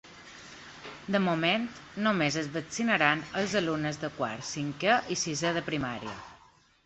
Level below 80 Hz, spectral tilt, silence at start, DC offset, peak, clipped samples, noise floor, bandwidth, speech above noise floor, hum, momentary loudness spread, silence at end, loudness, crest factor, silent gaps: -64 dBFS; -4 dB/octave; 0.05 s; under 0.1%; -8 dBFS; under 0.1%; -60 dBFS; 8.2 kHz; 31 dB; none; 18 LU; 0.5 s; -29 LUFS; 24 dB; none